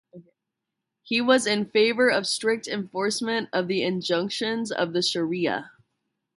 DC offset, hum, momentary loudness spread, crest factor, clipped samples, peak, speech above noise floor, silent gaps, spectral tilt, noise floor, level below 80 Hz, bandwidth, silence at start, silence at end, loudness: under 0.1%; none; 7 LU; 20 dB; under 0.1%; -6 dBFS; 59 dB; none; -3.5 dB/octave; -84 dBFS; -72 dBFS; 11.5 kHz; 0.15 s; 0.7 s; -24 LUFS